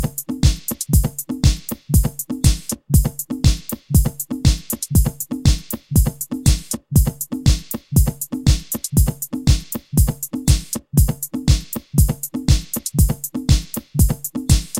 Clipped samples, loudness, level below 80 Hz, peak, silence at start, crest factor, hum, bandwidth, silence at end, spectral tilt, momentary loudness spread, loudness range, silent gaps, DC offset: under 0.1%; -19 LUFS; -22 dBFS; -2 dBFS; 0 s; 16 dB; none; 17 kHz; 0 s; -5 dB/octave; 5 LU; 0 LU; none; under 0.1%